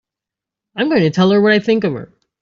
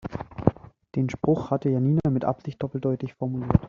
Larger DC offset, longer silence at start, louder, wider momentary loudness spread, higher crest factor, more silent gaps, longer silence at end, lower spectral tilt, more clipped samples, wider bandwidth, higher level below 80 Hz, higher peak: neither; first, 0.75 s vs 0.05 s; first, -14 LUFS vs -26 LUFS; first, 13 LU vs 9 LU; second, 14 dB vs 24 dB; neither; first, 0.35 s vs 0 s; second, -7 dB/octave vs -9.5 dB/octave; neither; about the same, 7.4 kHz vs 7 kHz; second, -56 dBFS vs -46 dBFS; about the same, -4 dBFS vs -2 dBFS